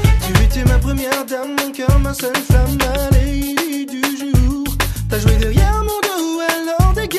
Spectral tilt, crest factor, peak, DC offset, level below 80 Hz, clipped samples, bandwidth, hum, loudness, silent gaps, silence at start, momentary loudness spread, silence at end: -5.5 dB/octave; 14 dB; 0 dBFS; under 0.1%; -18 dBFS; under 0.1%; 14 kHz; none; -17 LUFS; none; 0 s; 5 LU; 0 s